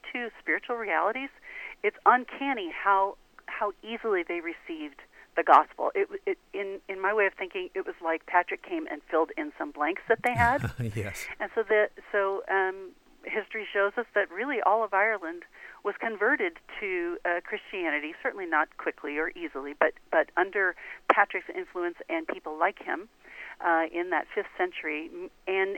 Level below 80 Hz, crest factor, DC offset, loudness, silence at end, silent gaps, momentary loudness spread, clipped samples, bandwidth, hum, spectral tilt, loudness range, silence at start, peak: -58 dBFS; 24 dB; under 0.1%; -29 LUFS; 0 s; none; 12 LU; under 0.1%; 16.5 kHz; none; -5.5 dB/octave; 3 LU; 0.05 s; -6 dBFS